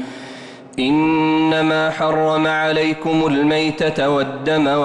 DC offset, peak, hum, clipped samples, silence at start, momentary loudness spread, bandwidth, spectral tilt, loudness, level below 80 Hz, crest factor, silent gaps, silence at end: under 0.1%; -8 dBFS; none; under 0.1%; 0 s; 11 LU; 9.8 kHz; -6 dB/octave; -17 LUFS; -52 dBFS; 10 dB; none; 0 s